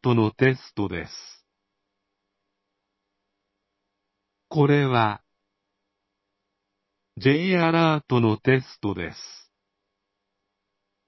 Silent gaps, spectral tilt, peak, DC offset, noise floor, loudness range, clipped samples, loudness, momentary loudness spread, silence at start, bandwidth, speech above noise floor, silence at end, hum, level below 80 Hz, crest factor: none; -7.5 dB/octave; -6 dBFS; under 0.1%; -80 dBFS; 7 LU; under 0.1%; -22 LUFS; 16 LU; 0.05 s; 6 kHz; 58 dB; 1.7 s; none; -56 dBFS; 20 dB